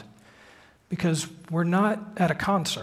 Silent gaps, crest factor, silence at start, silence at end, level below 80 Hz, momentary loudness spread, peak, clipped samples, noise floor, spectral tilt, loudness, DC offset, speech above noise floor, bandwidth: none; 18 dB; 0 s; 0 s; -58 dBFS; 7 LU; -8 dBFS; under 0.1%; -54 dBFS; -5.5 dB/octave; -26 LUFS; under 0.1%; 29 dB; 15 kHz